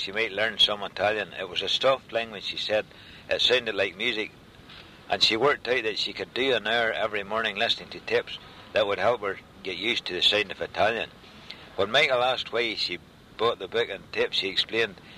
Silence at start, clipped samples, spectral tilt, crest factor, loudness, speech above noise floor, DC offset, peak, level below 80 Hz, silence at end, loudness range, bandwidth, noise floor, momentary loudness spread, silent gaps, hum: 0 s; under 0.1%; -3 dB/octave; 18 dB; -25 LUFS; 21 dB; under 0.1%; -8 dBFS; -60 dBFS; 0 s; 2 LU; 15 kHz; -48 dBFS; 12 LU; none; none